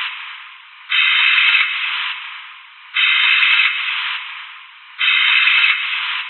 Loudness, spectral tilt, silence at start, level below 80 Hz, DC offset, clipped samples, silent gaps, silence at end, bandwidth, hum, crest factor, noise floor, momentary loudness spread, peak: -13 LUFS; 17 dB/octave; 0 s; under -90 dBFS; under 0.1%; under 0.1%; none; 0 s; 4.4 kHz; none; 18 dB; -39 dBFS; 19 LU; 0 dBFS